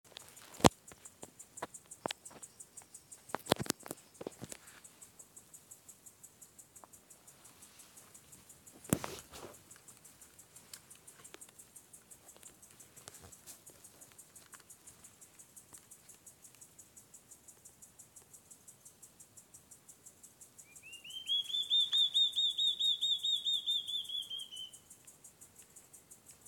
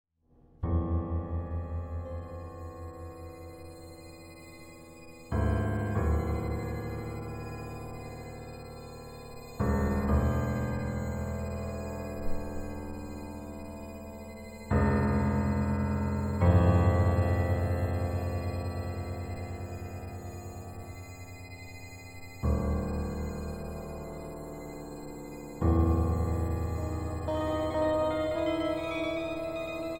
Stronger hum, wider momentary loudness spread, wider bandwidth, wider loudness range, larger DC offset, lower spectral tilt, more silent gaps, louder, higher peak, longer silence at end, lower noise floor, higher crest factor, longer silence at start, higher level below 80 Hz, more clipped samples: neither; first, 26 LU vs 18 LU; about the same, 17 kHz vs 16.5 kHz; first, 25 LU vs 12 LU; neither; second, -2.5 dB/octave vs -8 dB/octave; neither; about the same, -33 LUFS vs -32 LUFS; first, 0 dBFS vs -10 dBFS; first, 0.15 s vs 0 s; about the same, -60 dBFS vs -63 dBFS; first, 42 dB vs 20 dB; second, 0.2 s vs 0.6 s; second, -66 dBFS vs -40 dBFS; neither